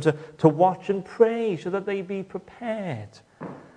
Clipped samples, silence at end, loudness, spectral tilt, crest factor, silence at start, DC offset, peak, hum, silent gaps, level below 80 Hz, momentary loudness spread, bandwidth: under 0.1%; 0.15 s; -25 LUFS; -8 dB/octave; 22 dB; 0 s; under 0.1%; -2 dBFS; none; none; -66 dBFS; 19 LU; 9.8 kHz